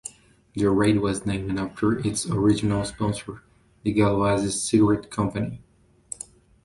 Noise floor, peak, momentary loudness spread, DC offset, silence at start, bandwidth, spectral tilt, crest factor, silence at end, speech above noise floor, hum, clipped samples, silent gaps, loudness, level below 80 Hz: -45 dBFS; -8 dBFS; 18 LU; under 0.1%; 0.05 s; 11.5 kHz; -5.5 dB/octave; 16 dB; 1.05 s; 22 dB; none; under 0.1%; none; -24 LUFS; -48 dBFS